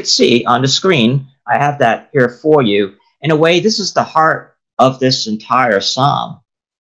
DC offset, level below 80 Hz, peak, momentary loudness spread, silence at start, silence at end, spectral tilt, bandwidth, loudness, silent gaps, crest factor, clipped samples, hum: under 0.1%; -58 dBFS; 0 dBFS; 9 LU; 0 s; 0.6 s; -4.5 dB/octave; 11 kHz; -13 LUFS; none; 14 dB; 0.2%; none